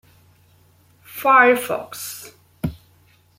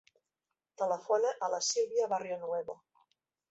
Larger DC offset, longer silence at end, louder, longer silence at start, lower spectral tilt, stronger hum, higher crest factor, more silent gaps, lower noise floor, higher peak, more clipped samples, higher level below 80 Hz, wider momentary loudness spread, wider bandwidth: neither; about the same, 0.65 s vs 0.75 s; first, -18 LUFS vs -33 LUFS; first, 1.15 s vs 0.8 s; first, -4 dB/octave vs -1.5 dB/octave; neither; about the same, 20 dB vs 18 dB; neither; second, -56 dBFS vs -89 dBFS; first, -2 dBFS vs -16 dBFS; neither; first, -52 dBFS vs -82 dBFS; first, 20 LU vs 8 LU; first, 16.5 kHz vs 8.2 kHz